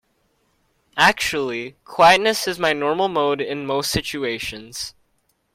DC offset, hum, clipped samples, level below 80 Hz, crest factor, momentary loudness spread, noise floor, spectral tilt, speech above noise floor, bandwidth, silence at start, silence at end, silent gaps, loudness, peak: under 0.1%; none; under 0.1%; -50 dBFS; 20 dB; 16 LU; -67 dBFS; -3 dB/octave; 47 dB; 16.5 kHz; 0.95 s; 0.65 s; none; -19 LUFS; -2 dBFS